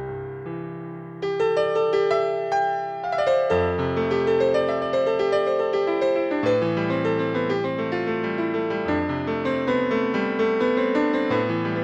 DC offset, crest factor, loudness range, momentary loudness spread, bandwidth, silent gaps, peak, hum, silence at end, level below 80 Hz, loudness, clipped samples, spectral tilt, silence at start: under 0.1%; 12 dB; 2 LU; 6 LU; 8.4 kHz; none; -10 dBFS; none; 0 s; -54 dBFS; -23 LUFS; under 0.1%; -7 dB/octave; 0 s